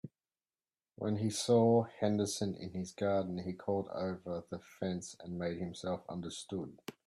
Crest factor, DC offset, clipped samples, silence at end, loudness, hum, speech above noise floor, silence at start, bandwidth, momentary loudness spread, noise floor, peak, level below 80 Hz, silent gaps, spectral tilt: 18 dB; under 0.1%; under 0.1%; 0.15 s; -36 LUFS; none; over 54 dB; 0.05 s; 14 kHz; 13 LU; under -90 dBFS; -18 dBFS; -72 dBFS; none; -6 dB/octave